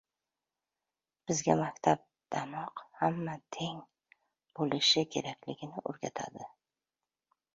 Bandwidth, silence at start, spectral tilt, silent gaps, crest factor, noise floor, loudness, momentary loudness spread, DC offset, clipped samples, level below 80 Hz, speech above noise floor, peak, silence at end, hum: 7.6 kHz; 1.25 s; -3.5 dB/octave; none; 26 dB; under -90 dBFS; -33 LUFS; 17 LU; under 0.1%; under 0.1%; -72 dBFS; over 57 dB; -10 dBFS; 1.1 s; none